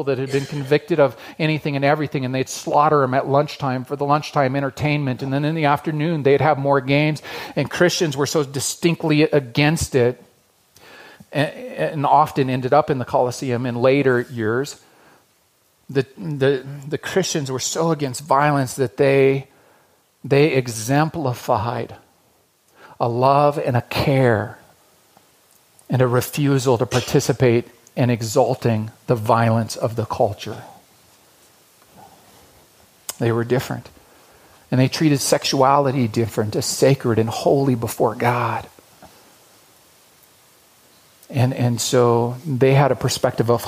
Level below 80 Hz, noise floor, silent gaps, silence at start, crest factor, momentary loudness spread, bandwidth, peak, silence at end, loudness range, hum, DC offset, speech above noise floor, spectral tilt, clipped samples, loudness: -52 dBFS; -60 dBFS; none; 0 s; 18 dB; 8 LU; 15.5 kHz; -2 dBFS; 0 s; 6 LU; none; under 0.1%; 42 dB; -5.5 dB/octave; under 0.1%; -19 LUFS